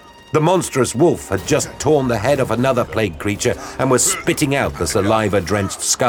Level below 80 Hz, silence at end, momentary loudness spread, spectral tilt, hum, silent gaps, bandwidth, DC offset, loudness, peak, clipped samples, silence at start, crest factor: -40 dBFS; 0 s; 5 LU; -4.5 dB/octave; none; none; over 20 kHz; under 0.1%; -17 LUFS; -2 dBFS; under 0.1%; 0.05 s; 16 dB